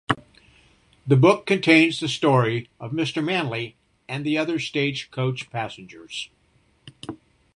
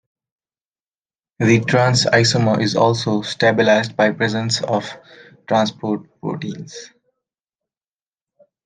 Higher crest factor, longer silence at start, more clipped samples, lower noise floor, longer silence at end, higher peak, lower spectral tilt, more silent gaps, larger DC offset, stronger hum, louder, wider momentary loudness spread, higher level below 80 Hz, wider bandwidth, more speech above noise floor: about the same, 22 dB vs 18 dB; second, 0.1 s vs 1.4 s; neither; second, -62 dBFS vs under -90 dBFS; second, 0.4 s vs 1.8 s; about the same, -2 dBFS vs 0 dBFS; about the same, -6 dB/octave vs -5 dB/octave; neither; neither; neither; second, -22 LUFS vs -17 LUFS; first, 22 LU vs 14 LU; about the same, -60 dBFS vs -56 dBFS; first, 11 kHz vs 9.8 kHz; second, 40 dB vs over 73 dB